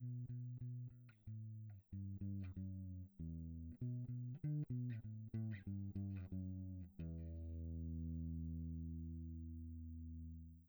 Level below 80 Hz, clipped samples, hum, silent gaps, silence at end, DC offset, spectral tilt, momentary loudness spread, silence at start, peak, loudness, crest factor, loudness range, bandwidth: -58 dBFS; under 0.1%; none; none; 0 s; under 0.1%; -11 dB/octave; 7 LU; 0 s; -36 dBFS; -50 LUFS; 12 dB; 4 LU; over 20 kHz